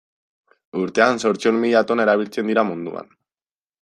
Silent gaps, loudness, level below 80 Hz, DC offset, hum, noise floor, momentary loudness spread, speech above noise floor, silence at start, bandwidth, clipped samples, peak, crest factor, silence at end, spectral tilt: none; -19 LUFS; -68 dBFS; under 0.1%; none; under -90 dBFS; 13 LU; over 71 dB; 0.75 s; 11.5 kHz; under 0.1%; -2 dBFS; 18 dB; 0.8 s; -5 dB/octave